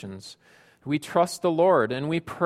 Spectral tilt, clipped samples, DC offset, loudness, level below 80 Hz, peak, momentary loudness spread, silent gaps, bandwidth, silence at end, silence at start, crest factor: -6 dB/octave; under 0.1%; under 0.1%; -24 LUFS; -66 dBFS; -6 dBFS; 21 LU; none; 15 kHz; 0 s; 0 s; 18 dB